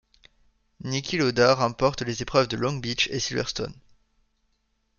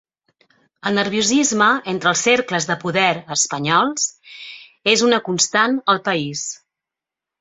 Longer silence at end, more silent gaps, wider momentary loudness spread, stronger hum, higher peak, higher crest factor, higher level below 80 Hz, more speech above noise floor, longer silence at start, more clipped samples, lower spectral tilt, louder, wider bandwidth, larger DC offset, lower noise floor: first, 1.25 s vs 0.85 s; neither; about the same, 10 LU vs 12 LU; neither; second, -6 dBFS vs 0 dBFS; about the same, 20 dB vs 20 dB; first, -52 dBFS vs -62 dBFS; second, 47 dB vs 68 dB; about the same, 0.85 s vs 0.85 s; neither; first, -4.5 dB/octave vs -2.5 dB/octave; second, -25 LUFS vs -17 LUFS; second, 7.2 kHz vs 8.4 kHz; neither; second, -72 dBFS vs -86 dBFS